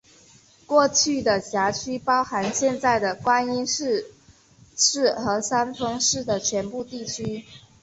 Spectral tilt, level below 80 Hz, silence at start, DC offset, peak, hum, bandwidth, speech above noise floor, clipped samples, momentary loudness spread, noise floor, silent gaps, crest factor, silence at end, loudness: -2.5 dB/octave; -56 dBFS; 0.7 s; under 0.1%; -6 dBFS; none; 8.2 kHz; 31 dB; under 0.1%; 12 LU; -54 dBFS; none; 20 dB; 0.25 s; -23 LUFS